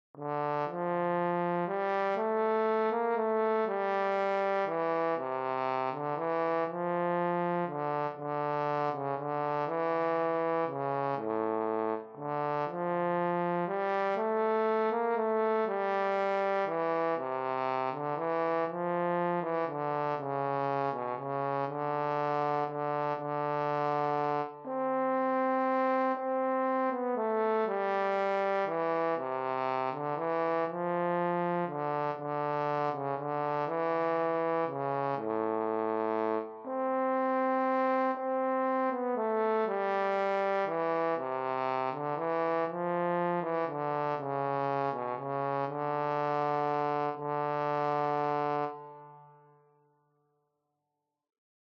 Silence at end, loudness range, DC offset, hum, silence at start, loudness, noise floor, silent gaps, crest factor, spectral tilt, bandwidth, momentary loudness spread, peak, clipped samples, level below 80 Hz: 2.35 s; 2 LU; under 0.1%; none; 0.15 s; -31 LUFS; -86 dBFS; none; 14 dB; -5.5 dB/octave; 6.6 kHz; 4 LU; -18 dBFS; under 0.1%; -84 dBFS